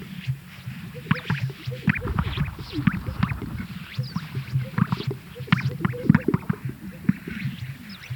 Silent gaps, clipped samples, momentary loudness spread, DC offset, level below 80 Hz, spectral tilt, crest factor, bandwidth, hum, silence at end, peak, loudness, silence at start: none; under 0.1%; 12 LU; under 0.1%; -44 dBFS; -7.5 dB/octave; 26 dB; 19.5 kHz; none; 0 s; -2 dBFS; -27 LUFS; 0 s